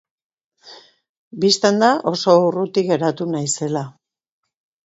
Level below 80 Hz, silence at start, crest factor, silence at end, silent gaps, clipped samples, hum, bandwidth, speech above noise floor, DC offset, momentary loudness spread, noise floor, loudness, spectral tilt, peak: -66 dBFS; 0.65 s; 20 dB; 0.95 s; 1.09-1.31 s; under 0.1%; none; 8.2 kHz; 29 dB; under 0.1%; 10 LU; -46 dBFS; -18 LUFS; -4.5 dB/octave; 0 dBFS